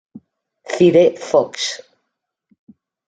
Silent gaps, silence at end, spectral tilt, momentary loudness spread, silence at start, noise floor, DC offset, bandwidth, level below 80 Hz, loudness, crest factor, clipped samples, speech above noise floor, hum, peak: none; 1.3 s; -5 dB/octave; 15 LU; 0.15 s; -77 dBFS; under 0.1%; 9.2 kHz; -64 dBFS; -16 LUFS; 18 dB; under 0.1%; 62 dB; none; -2 dBFS